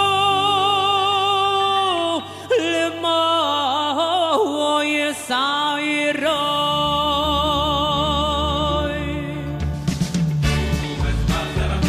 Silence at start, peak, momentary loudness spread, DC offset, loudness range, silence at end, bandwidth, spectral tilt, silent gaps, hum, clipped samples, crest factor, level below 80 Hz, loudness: 0 s; -6 dBFS; 6 LU; under 0.1%; 3 LU; 0 s; 15 kHz; -4.5 dB/octave; none; none; under 0.1%; 14 dB; -32 dBFS; -19 LUFS